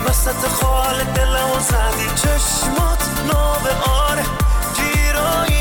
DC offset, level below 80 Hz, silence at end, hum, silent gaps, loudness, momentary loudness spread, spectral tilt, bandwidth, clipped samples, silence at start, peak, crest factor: under 0.1%; -20 dBFS; 0 s; none; none; -17 LUFS; 2 LU; -3.5 dB/octave; over 20 kHz; under 0.1%; 0 s; -8 dBFS; 10 dB